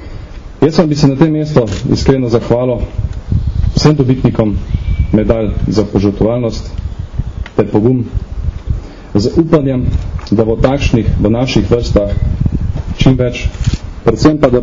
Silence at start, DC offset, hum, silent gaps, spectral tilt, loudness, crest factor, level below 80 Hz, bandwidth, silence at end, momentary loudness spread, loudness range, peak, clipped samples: 0 s; under 0.1%; none; none; -7.5 dB/octave; -13 LUFS; 12 dB; -20 dBFS; 7.6 kHz; 0 s; 11 LU; 3 LU; 0 dBFS; 0.5%